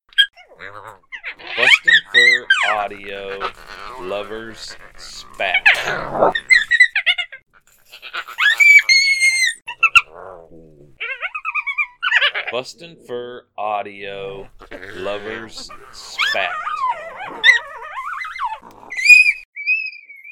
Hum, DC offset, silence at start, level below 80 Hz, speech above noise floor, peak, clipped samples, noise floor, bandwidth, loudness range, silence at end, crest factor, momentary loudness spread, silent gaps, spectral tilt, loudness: none; under 0.1%; 0.15 s; -50 dBFS; 23 dB; 0 dBFS; under 0.1%; -47 dBFS; 18.5 kHz; 11 LU; 0 s; 18 dB; 24 LU; 19.45-19.53 s; 0 dB/octave; -14 LUFS